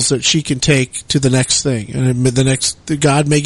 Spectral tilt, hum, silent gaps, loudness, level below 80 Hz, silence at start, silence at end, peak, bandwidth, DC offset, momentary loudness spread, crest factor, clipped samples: -4 dB/octave; none; none; -14 LUFS; -40 dBFS; 0 s; 0 s; 0 dBFS; 11.5 kHz; under 0.1%; 5 LU; 14 dB; under 0.1%